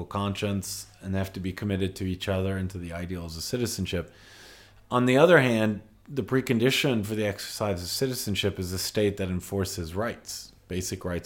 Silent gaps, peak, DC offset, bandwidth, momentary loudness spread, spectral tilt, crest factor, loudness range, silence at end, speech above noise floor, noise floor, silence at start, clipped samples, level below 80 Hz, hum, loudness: none; -6 dBFS; under 0.1%; 17 kHz; 13 LU; -5 dB/octave; 22 dB; 7 LU; 0 s; 24 dB; -51 dBFS; 0 s; under 0.1%; -52 dBFS; none; -27 LUFS